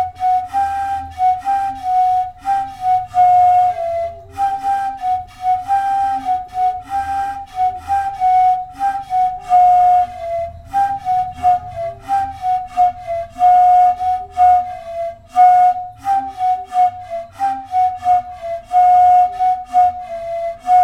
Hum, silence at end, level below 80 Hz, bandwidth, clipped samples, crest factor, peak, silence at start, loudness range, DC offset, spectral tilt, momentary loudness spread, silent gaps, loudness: none; 0 s; -46 dBFS; 10.5 kHz; under 0.1%; 12 dB; -2 dBFS; 0 s; 5 LU; under 0.1%; -4.5 dB/octave; 12 LU; none; -16 LUFS